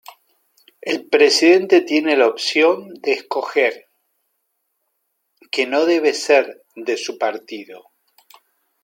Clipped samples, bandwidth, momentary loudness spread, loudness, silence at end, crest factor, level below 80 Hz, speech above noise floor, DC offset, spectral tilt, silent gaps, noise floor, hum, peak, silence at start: under 0.1%; 16.5 kHz; 16 LU; -17 LUFS; 1.05 s; 18 dB; -76 dBFS; 55 dB; under 0.1%; -2.5 dB/octave; none; -72 dBFS; none; -2 dBFS; 0.85 s